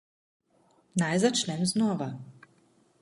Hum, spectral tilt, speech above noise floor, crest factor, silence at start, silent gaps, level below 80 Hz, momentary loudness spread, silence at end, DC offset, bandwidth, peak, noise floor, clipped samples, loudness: none; -4.5 dB/octave; 39 dB; 18 dB; 0.95 s; none; -70 dBFS; 11 LU; 0.7 s; under 0.1%; 11.5 kHz; -12 dBFS; -66 dBFS; under 0.1%; -28 LUFS